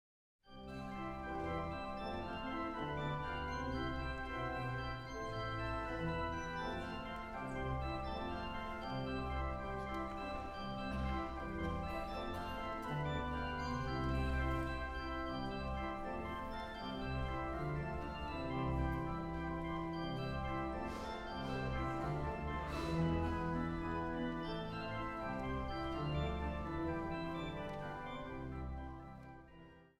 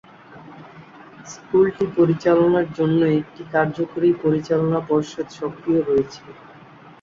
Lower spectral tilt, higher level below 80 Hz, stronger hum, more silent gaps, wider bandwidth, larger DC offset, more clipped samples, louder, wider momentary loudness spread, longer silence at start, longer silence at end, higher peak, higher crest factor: about the same, -7 dB/octave vs -7.5 dB/octave; first, -48 dBFS vs -56 dBFS; neither; neither; first, 13.5 kHz vs 7.4 kHz; neither; neither; second, -42 LUFS vs -20 LUFS; second, 6 LU vs 14 LU; first, 0.45 s vs 0.3 s; second, 0.15 s vs 0.7 s; second, -26 dBFS vs -6 dBFS; about the same, 16 dB vs 16 dB